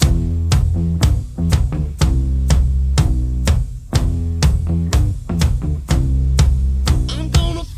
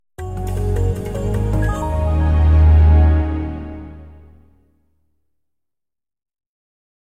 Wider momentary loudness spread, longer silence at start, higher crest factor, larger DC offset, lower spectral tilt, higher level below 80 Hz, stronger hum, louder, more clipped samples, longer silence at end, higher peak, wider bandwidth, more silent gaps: second, 4 LU vs 18 LU; second, 0 s vs 0.2 s; about the same, 14 dB vs 14 dB; first, 0.2% vs under 0.1%; second, -6 dB/octave vs -8.5 dB/octave; about the same, -18 dBFS vs -20 dBFS; neither; about the same, -18 LUFS vs -17 LUFS; neither; second, 0 s vs 2.9 s; first, 0 dBFS vs -4 dBFS; first, 14.5 kHz vs 8.6 kHz; neither